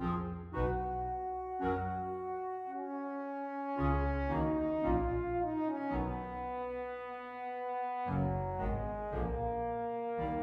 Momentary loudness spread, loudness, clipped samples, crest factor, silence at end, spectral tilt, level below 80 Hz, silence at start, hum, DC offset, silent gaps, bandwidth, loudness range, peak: 7 LU; -37 LUFS; under 0.1%; 16 dB; 0 s; -10 dB/octave; -44 dBFS; 0 s; none; under 0.1%; none; 5.4 kHz; 3 LU; -18 dBFS